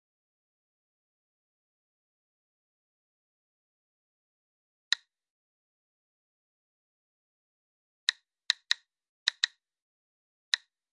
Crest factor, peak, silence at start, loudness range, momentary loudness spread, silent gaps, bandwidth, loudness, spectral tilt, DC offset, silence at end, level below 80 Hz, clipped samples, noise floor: 34 dB; -8 dBFS; 8.1 s; 8 LU; 3 LU; 9.09-9.26 s, 9.82-10.52 s; 10.5 kHz; -31 LUFS; 8.5 dB/octave; under 0.1%; 0.35 s; under -90 dBFS; under 0.1%; under -90 dBFS